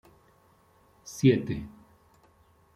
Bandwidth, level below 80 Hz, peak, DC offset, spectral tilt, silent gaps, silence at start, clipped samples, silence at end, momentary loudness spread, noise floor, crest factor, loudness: 15 kHz; -58 dBFS; -8 dBFS; under 0.1%; -7 dB/octave; none; 1.05 s; under 0.1%; 1.05 s; 24 LU; -62 dBFS; 22 dB; -26 LUFS